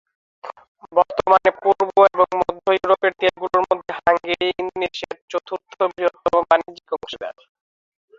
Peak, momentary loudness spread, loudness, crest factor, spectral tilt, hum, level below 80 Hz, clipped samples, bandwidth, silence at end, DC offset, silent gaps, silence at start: 0 dBFS; 16 LU; -19 LUFS; 20 dB; -4.5 dB/octave; none; -56 dBFS; under 0.1%; 7.6 kHz; 0.9 s; under 0.1%; 0.68-0.75 s, 5.22-5.28 s; 0.45 s